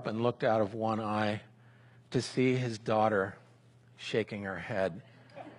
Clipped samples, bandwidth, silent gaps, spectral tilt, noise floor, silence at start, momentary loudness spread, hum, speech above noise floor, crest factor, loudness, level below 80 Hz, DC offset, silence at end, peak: under 0.1%; 11.5 kHz; none; -6 dB/octave; -60 dBFS; 0 s; 11 LU; none; 29 dB; 18 dB; -32 LUFS; -70 dBFS; under 0.1%; 0.05 s; -16 dBFS